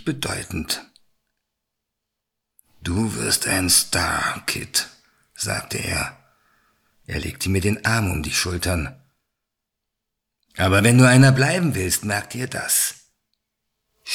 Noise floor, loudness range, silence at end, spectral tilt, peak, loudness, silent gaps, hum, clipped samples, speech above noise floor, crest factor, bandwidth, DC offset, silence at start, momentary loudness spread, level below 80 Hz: -81 dBFS; 8 LU; 0 s; -4 dB/octave; -2 dBFS; -20 LUFS; none; none; under 0.1%; 61 dB; 22 dB; 17 kHz; under 0.1%; 0 s; 15 LU; -44 dBFS